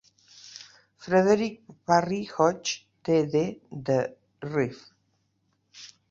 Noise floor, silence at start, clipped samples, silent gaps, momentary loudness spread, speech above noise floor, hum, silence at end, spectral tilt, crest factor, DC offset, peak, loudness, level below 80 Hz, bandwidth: -72 dBFS; 0.45 s; under 0.1%; none; 22 LU; 47 dB; none; 0.25 s; -5.5 dB/octave; 22 dB; under 0.1%; -6 dBFS; -26 LUFS; -66 dBFS; 7.8 kHz